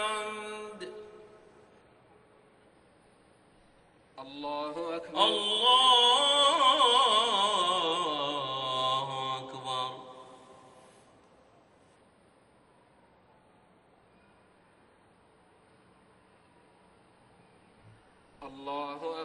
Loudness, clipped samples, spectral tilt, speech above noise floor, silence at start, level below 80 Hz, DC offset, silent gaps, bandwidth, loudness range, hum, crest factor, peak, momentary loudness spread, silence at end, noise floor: -26 LUFS; under 0.1%; -1.5 dB/octave; 34 dB; 0 s; -74 dBFS; under 0.1%; none; 11.5 kHz; 22 LU; none; 22 dB; -10 dBFS; 23 LU; 0 s; -63 dBFS